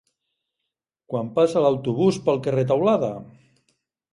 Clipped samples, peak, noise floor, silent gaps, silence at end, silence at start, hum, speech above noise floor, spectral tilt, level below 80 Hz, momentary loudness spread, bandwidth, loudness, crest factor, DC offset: under 0.1%; -6 dBFS; -83 dBFS; none; 0.85 s; 1.1 s; none; 62 dB; -7.5 dB/octave; -62 dBFS; 10 LU; 11.5 kHz; -22 LUFS; 18 dB; under 0.1%